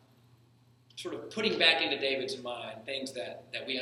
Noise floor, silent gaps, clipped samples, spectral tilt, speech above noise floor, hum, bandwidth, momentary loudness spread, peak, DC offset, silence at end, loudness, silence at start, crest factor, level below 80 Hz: -63 dBFS; none; under 0.1%; -3 dB/octave; 31 dB; none; 13.5 kHz; 17 LU; -8 dBFS; under 0.1%; 0 s; -31 LUFS; 0.95 s; 24 dB; -80 dBFS